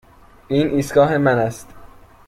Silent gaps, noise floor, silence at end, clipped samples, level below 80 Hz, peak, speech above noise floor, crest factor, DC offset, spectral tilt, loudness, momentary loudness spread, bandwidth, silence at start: none; -43 dBFS; 0.4 s; under 0.1%; -48 dBFS; -2 dBFS; 26 dB; 18 dB; under 0.1%; -6.5 dB/octave; -18 LUFS; 9 LU; 15.5 kHz; 0.5 s